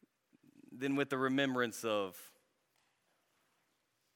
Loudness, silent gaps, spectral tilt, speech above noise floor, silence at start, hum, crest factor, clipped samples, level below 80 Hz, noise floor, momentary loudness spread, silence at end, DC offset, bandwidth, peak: -36 LUFS; none; -4.5 dB/octave; 44 dB; 0.7 s; none; 20 dB; under 0.1%; under -90 dBFS; -80 dBFS; 10 LU; 1.85 s; under 0.1%; 17.5 kHz; -20 dBFS